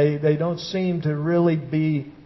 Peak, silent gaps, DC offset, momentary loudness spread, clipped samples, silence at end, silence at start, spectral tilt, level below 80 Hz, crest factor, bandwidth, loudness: -6 dBFS; none; under 0.1%; 5 LU; under 0.1%; 0.05 s; 0 s; -8 dB/octave; -58 dBFS; 14 dB; 6 kHz; -22 LUFS